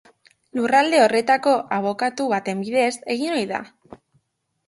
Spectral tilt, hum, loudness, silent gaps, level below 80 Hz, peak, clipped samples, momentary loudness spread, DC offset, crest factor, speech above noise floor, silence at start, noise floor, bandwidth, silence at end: -4 dB/octave; none; -20 LUFS; none; -68 dBFS; -4 dBFS; under 0.1%; 9 LU; under 0.1%; 18 dB; 52 dB; 0.55 s; -72 dBFS; 11.5 kHz; 0.7 s